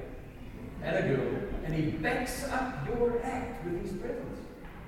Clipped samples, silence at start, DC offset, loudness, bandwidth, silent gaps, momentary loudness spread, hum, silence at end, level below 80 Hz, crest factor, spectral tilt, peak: under 0.1%; 0 s; under 0.1%; -33 LUFS; 16.5 kHz; none; 15 LU; none; 0 s; -46 dBFS; 16 dB; -6 dB/octave; -16 dBFS